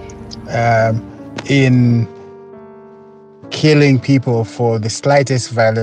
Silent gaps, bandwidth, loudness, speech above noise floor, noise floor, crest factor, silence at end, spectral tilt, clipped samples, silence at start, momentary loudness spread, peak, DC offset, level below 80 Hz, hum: none; 9.6 kHz; -14 LUFS; 27 dB; -40 dBFS; 14 dB; 0 s; -6.5 dB/octave; under 0.1%; 0 s; 15 LU; 0 dBFS; under 0.1%; -48 dBFS; none